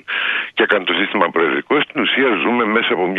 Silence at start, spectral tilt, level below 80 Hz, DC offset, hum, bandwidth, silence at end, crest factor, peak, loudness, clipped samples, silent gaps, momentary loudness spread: 0.1 s; -6.5 dB/octave; -66 dBFS; under 0.1%; none; 4.8 kHz; 0 s; 16 dB; 0 dBFS; -16 LUFS; under 0.1%; none; 3 LU